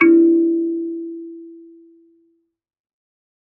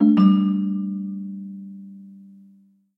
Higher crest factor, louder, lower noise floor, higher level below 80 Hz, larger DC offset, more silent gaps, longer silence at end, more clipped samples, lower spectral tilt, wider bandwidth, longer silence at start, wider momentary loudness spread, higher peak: about the same, 18 dB vs 16 dB; first, -17 LUFS vs -21 LUFS; first, -63 dBFS vs -55 dBFS; about the same, -70 dBFS vs -68 dBFS; neither; neither; first, 2 s vs 0.8 s; neither; second, -6 dB/octave vs -10.5 dB/octave; second, 2.9 kHz vs 5.6 kHz; about the same, 0 s vs 0 s; about the same, 25 LU vs 25 LU; first, -2 dBFS vs -6 dBFS